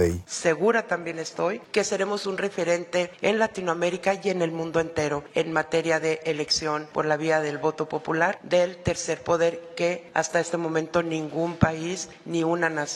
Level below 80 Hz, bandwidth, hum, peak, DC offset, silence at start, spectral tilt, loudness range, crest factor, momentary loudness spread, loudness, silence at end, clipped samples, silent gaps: -54 dBFS; 12 kHz; none; -4 dBFS; under 0.1%; 0 s; -4.5 dB/octave; 1 LU; 22 dB; 5 LU; -26 LUFS; 0 s; under 0.1%; none